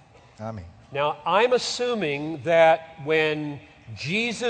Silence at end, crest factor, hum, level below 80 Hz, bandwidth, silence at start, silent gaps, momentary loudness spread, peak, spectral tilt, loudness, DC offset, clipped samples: 0 s; 20 dB; none; -60 dBFS; 9.4 kHz; 0.4 s; none; 18 LU; -6 dBFS; -4 dB/octave; -23 LUFS; under 0.1%; under 0.1%